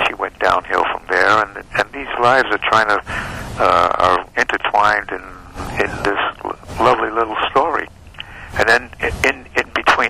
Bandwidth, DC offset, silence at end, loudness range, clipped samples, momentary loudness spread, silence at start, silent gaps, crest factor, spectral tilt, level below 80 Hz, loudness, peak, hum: 16 kHz; under 0.1%; 0 s; 3 LU; under 0.1%; 13 LU; 0 s; none; 16 dB; -4 dB/octave; -40 dBFS; -16 LUFS; -2 dBFS; none